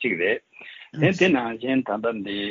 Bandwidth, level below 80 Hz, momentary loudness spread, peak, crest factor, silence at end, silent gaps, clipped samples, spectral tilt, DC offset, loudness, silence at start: 7.4 kHz; -64 dBFS; 18 LU; -6 dBFS; 18 dB; 0 s; none; under 0.1%; -4.5 dB/octave; under 0.1%; -23 LUFS; 0 s